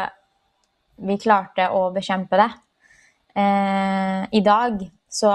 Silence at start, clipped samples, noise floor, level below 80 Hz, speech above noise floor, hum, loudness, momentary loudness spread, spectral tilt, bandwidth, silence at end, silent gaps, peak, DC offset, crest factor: 0 s; under 0.1%; -68 dBFS; -60 dBFS; 48 dB; none; -21 LUFS; 12 LU; -5.5 dB/octave; 11.5 kHz; 0 s; none; -2 dBFS; under 0.1%; 20 dB